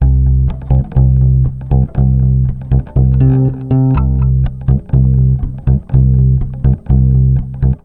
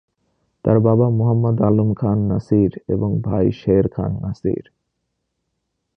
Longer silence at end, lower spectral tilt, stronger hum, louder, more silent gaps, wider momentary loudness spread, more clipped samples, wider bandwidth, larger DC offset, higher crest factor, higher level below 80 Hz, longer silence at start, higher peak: second, 0.05 s vs 1.35 s; first, -13 dB/octave vs -11.5 dB/octave; neither; first, -13 LUFS vs -18 LUFS; neither; second, 5 LU vs 8 LU; neither; second, 2.8 kHz vs 5.4 kHz; first, 0.7% vs under 0.1%; second, 10 dB vs 18 dB; first, -16 dBFS vs -42 dBFS; second, 0 s vs 0.65 s; about the same, 0 dBFS vs -2 dBFS